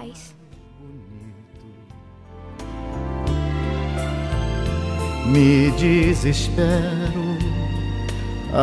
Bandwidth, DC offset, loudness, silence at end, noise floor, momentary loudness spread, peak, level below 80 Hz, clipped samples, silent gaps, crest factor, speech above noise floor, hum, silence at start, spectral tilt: 11 kHz; under 0.1%; -21 LUFS; 0 s; -43 dBFS; 24 LU; -4 dBFS; -30 dBFS; under 0.1%; none; 18 dB; 26 dB; none; 0 s; -6.5 dB/octave